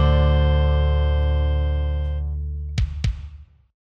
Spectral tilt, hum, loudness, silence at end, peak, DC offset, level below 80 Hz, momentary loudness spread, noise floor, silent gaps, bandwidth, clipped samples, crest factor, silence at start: -8 dB/octave; none; -22 LUFS; 0.4 s; -6 dBFS; under 0.1%; -22 dBFS; 10 LU; -41 dBFS; none; 6.8 kHz; under 0.1%; 14 dB; 0 s